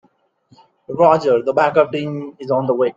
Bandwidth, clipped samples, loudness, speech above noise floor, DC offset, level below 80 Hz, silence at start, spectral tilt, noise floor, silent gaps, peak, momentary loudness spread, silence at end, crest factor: 7.6 kHz; under 0.1%; -16 LUFS; 41 dB; under 0.1%; -62 dBFS; 0.9 s; -7.5 dB/octave; -57 dBFS; none; 0 dBFS; 13 LU; 0.05 s; 18 dB